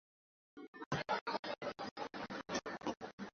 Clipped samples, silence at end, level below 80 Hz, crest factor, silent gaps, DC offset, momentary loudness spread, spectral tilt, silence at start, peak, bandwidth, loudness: under 0.1%; 0.05 s; -74 dBFS; 20 dB; 0.68-0.73 s, 0.86-0.91 s, 1.21-1.26 s, 1.39-1.43 s, 1.91-1.96 s, 3.13-3.18 s; under 0.1%; 15 LU; -3 dB/octave; 0.55 s; -24 dBFS; 7.4 kHz; -43 LUFS